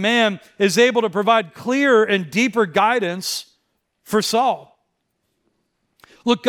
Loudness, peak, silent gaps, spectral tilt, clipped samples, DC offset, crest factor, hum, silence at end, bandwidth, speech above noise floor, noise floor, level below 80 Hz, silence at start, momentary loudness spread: -18 LUFS; -2 dBFS; none; -4 dB/octave; under 0.1%; under 0.1%; 16 dB; none; 0 s; 18 kHz; 54 dB; -72 dBFS; -68 dBFS; 0 s; 9 LU